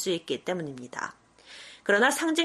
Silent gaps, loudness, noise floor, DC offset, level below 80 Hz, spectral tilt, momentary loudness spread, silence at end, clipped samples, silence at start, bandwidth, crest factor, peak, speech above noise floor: none; -27 LUFS; -49 dBFS; under 0.1%; -72 dBFS; -3 dB/octave; 23 LU; 0 s; under 0.1%; 0 s; 13.5 kHz; 20 dB; -8 dBFS; 22 dB